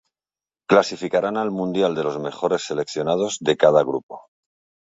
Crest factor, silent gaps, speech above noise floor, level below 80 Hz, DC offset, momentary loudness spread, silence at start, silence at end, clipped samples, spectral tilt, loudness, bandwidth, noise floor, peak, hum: 20 dB; 4.03-4.09 s; over 70 dB; -64 dBFS; under 0.1%; 10 LU; 0.7 s; 0.65 s; under 0.1%; -5 dB/octave; -21 LUFS; 8 kHz; under -90 dBFS; -2 dBFS; none